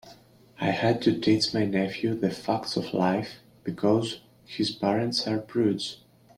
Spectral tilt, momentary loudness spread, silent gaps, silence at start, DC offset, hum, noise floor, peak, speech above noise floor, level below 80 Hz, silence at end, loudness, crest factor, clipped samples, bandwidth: -5.5 dB/octave; 12 LU; none; 0.05 s; under 0.1%; none; -54 dBFS; -10 dBFS; 28 dB; -64 dBFS; 0.45 s; -27 LUFS; 18 dB; under 0.1%; 13.5 kHz